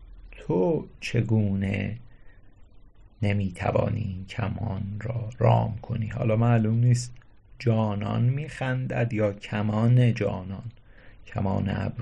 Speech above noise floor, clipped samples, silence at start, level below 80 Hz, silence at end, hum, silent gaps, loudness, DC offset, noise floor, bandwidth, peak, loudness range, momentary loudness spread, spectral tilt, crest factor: 25 dB; under 0.1%; 0 s; -46 dBFS; 0 s; none; none; -26 LUFS; under 0.1%; -50 dBFS; 9.8 kHz; -8 dBFS; 5 LU; 11 LU; -8 dB/octave; 18 dB